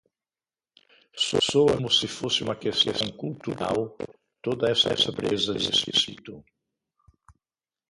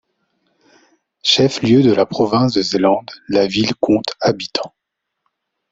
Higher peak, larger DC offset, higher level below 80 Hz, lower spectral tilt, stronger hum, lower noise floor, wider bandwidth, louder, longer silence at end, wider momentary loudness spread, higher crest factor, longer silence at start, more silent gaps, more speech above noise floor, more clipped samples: second, -8 dBFS vs 0 dBFS; neither; about the same, -58 dBFS vs -54 dBFS; second, -3.5 dB/octave vs -5.5 dB/octave; neither; first, under -90 dBFS vs -72 dBFS; first, 11.5 kHz vs 8 kHz; second, -24 LUFS vs -16 LUFS; first, 1.5 s vs 1.05 s; first, 14 LU vs 9 LU; about the same, 20 dB vs 16 dB; about the same, 1.15 s vs 1.25 s; neither; first, over 64 dB vs 57 dB; neither